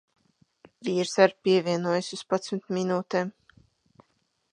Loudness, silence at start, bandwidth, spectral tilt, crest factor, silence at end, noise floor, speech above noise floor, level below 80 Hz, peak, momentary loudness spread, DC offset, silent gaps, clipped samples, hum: -26 LUFS; 0.8 s; 10.5 kHz; -5 dB/octave; 24 dB; 1.25 s; -73 dBFS; 47 dB; -76 dBFS; -4 dBFS; 9 LU; under 0.1%; none; under 0.1%; none